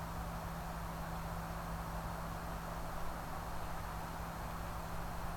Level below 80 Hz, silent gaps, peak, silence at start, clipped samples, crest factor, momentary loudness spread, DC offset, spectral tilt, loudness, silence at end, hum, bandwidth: -48 dBFS; none; -30 dBFS; 0 s; under 0.1%; 12 dB; 1 LU; under 0.1%; -5.5 dB/octave; -44 LUFS; 0 s; 50 Hz at -50 dBFS; 19 kHz